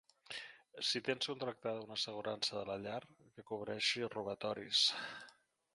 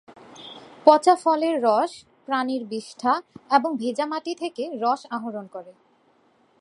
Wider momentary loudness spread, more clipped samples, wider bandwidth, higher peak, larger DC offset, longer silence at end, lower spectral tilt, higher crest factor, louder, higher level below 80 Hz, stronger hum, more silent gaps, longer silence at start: second, 15 LU vs 23 LU; neither; about the same, 11.5 kHz vs 11 kHz; second, -20 dBFS vs 0 dBFS; neither; second, 0.45 s vs 0.9 s; second, -2.5 dB/octave vs -4 dB/octave; about the same, 22 dB vs 24 dB; second, -39 LUFS vs -23 LUFS; about the same, -80 dBFS vs -76 dBFS; neither; neither; first, 0.3 s vs 0.1 s